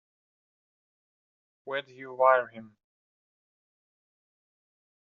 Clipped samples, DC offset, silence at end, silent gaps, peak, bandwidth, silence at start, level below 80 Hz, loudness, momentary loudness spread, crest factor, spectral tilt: under 0.1%; under 0.1%; 2.4 s; none; -8 dBFS; 5 kHz; 1.65 s; under -90 dBFS; -27 LUFS; 18 LU; 26 dB; -1 dB/octave